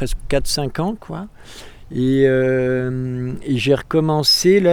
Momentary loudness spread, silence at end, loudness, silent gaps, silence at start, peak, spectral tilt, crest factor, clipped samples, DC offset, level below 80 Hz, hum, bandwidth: 16 LU; 0 s; -18 LUFS; none; 0 s; -4 dBFS; -5 dB/octave; 14 dB; under 0.1%; under 0.1%; -34 dBFS; none; 19.5 kHz